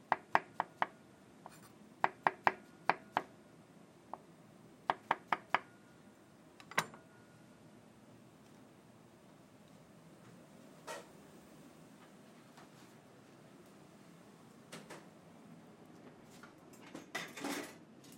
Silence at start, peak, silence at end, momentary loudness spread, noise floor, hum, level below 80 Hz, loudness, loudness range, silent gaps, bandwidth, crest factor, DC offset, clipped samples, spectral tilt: 0 s; -10 dBFS; 0 s; 24 LU; -62 dBFS; none; -84 dBFS; -40 LUFS; 19 LU; none; 16.5 kHz; 36 dB; under 0.1%; under 0.1%; -3.5 dB/octave